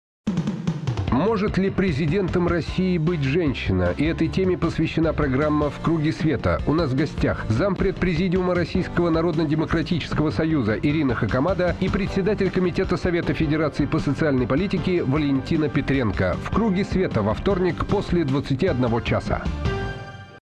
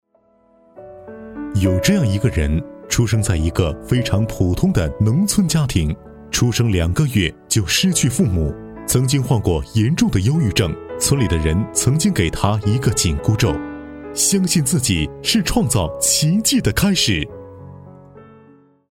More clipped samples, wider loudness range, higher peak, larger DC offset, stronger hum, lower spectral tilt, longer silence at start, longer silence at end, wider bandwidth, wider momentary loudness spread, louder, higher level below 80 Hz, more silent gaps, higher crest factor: neither; about the same, 0 LU vs 2 LU; second, -10 dBFS vs -2 dBFS; neither; neither; first, -8 dB/octave vs -4.5 dB/octave; second, 0.25 s vs 0.75 s; second, 0.1 s vs 0.7 s; second, 9.6 kHz vs 17 kHz; second, 3 LU vs 9 LU; second, -22 LUFS vs -18 LUFS; about the same, -34 dBFS vs -32 dBFS; neither; about the same, 12 dB vs 16 dB